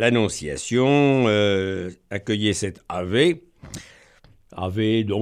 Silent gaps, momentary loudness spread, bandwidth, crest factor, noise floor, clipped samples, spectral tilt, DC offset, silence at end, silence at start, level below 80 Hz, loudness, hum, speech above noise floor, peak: none; 19 LU; 13.5 kHz; 18 dB; -53 dBFS; under 0.1%; -5 dB/octave; under 0.1%; 0 s; 0 s; -52 dBFS; -22 LUFS; none; 32 dB; -4 dBFS